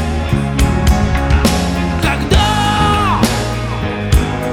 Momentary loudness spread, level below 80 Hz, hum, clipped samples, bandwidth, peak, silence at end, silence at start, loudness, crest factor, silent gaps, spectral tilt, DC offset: 5 LU; -18 dBFS; none; under 0.1%; 16.5 kHz; -2 dBFS; 0 s; 0 s; -14 LUFS; 12 dB; none; -5.5 dB/octave; under 0.1%